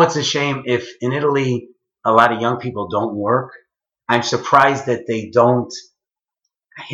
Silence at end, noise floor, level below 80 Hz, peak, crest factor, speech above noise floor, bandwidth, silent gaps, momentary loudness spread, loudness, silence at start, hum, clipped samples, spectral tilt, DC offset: 0 s; -86 dBFS; -62 dBFS; 0 dBFS; 18 dB; 69 dB; 10 kHz; none; 11 LU; -17 LUFS; 0 s; none; under 0.1%; -5 dB/octave; under 0.1%